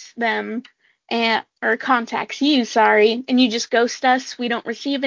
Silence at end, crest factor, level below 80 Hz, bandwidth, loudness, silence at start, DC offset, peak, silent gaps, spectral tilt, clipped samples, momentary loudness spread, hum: 0 s; 16 dB; -70 dBFS; 7.6 kHz; -19 LUFS; 0 s; under 0.1%; -4 dBFS; none; -3 dB/octave; under 0.1%; 9 LU; none